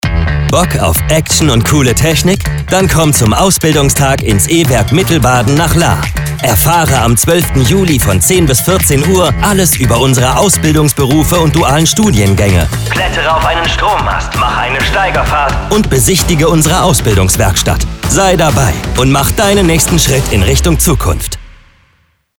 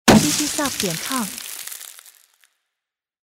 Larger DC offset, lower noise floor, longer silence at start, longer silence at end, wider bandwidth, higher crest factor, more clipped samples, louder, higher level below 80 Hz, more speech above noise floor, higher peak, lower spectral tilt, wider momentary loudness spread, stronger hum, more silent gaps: neither; second, -54 dBFS vs -85 dBFS; about the same, 0.05 s vs 0.05 s; second, 0.85 s vs 1.45 s; first, over 20 kHz vs 16.5 kHz; second, 10 dB vs 22 dB; neither; first, -9 LUFS vs -20 LUFS; first, -20 dBFS vs -44 dBFS; second, 45 dB vs 62 dB; about the same, 0 dBFS vs 0 dBFS; about the same, -4.5 dB/octave vs -3.5 dB/octave; second, 4 LU vs 18 LU; neither; neither